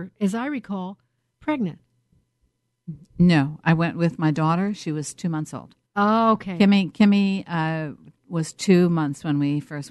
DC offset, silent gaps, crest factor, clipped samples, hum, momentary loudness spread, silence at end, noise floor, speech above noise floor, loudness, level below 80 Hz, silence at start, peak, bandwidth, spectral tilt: under 0.1%; none; 18 dB; under 0.1%; none; 14 LU; 0 s; -71 dBFS; 49 dB; -22 LUFS; -56 dBFS; 0 s; -4 dBFS; 12 kHz; -6.5 dB/octave